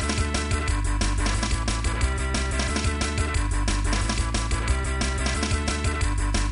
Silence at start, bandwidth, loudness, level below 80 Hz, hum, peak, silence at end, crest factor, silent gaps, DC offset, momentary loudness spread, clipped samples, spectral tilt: 0 s; 11 kHz; -25 LUFS; -26 dBFS; none; -10 dBFS; 0 s; 14 dB; none; under 0.1%; 1 LU; under 0.1%; -4 dB/octave